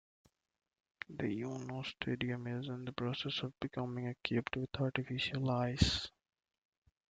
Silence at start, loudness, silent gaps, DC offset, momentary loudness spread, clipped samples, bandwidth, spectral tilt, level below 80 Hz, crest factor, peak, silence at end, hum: 1.1 s; -38 LUFS; none; under 0.1%; 9 LU; under 0.1%; 9.2 kHz; -5.5 dB/octave; -56 dBFS; 26 dB; -12 dBFS; 1 s; none